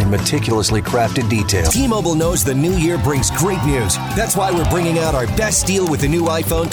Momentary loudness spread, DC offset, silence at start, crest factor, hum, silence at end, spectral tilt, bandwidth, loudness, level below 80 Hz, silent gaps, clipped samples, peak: 2 LU; under 0.1%; 0 s; 12 dB; none; 0 s; -4.5 dB/octave; over 20 kHz; -16 LUFS; -28 dBFS; none; under 0.1%; -4 dBFS